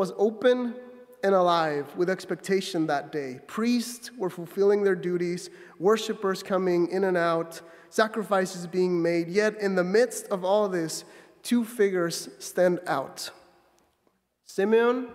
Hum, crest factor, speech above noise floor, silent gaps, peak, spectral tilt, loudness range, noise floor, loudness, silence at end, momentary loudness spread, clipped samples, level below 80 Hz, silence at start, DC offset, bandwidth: none; 20 dB; 45 dB; none; -6 dBFS; -5 dB/octave; 3 LU; -71 dBFS; -26 LUFS; 0 s; 12 LU; under 0.1%; -76 dBFS; 0 s; under 0.1%; 16 kHz